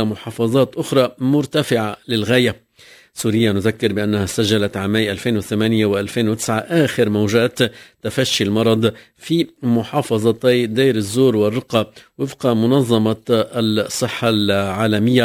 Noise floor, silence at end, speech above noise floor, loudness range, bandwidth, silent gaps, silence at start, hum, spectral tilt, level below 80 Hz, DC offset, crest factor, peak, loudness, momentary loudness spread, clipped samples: -47 dBFS; 0 s; 30 dB; 1 LU; 16 kHz; none; 0 s; none; -5.5 dB/octave; -48 dBFS; under 0.1%; 18 dB; 0 dBFS; -18 LUFS; 6 LU; under 0.1%